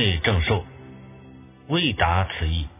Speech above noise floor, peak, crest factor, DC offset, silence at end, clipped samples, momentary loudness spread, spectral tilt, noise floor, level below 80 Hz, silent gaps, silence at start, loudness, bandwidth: 23 dB; -4 dBFS; 20 dB; under 0.1%; 0.1 s; under 0.1%; 23 LU; -9.5 dB/octave; -46 dBFS; -32 dBFS; none; 0 s; -23 LUFS; 3.9 kHz